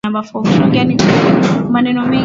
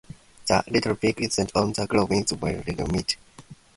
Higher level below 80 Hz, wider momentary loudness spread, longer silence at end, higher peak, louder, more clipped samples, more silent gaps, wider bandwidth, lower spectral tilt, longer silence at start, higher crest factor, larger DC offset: about the same, -42 dBFS vs -46 dBFS; second, 4 LU vs 7 LU; second, 0 s vs 0.25 s; first, 0 dBFS vs -4 dBFS; first, -12 LUFS vs -25 LUFS; neither; neither; second, 7.8 kHz vs 11.5 kHz; first, -6.5 dB/octave vs -4.5 dB/octave; second, 0.05 s vs 0.45 s; second, 12 dB vs 22 dB; neither